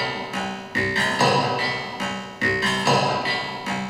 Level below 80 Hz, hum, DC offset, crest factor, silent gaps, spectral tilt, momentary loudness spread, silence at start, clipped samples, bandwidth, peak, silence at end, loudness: -54 dBFS; none; under 0.1%; 16 dB; none; -4 dB/octave; 9 LU; 0 s; under 0.1%; 15.5 kHz; -6 dBFS; 0 s; -22 LUFS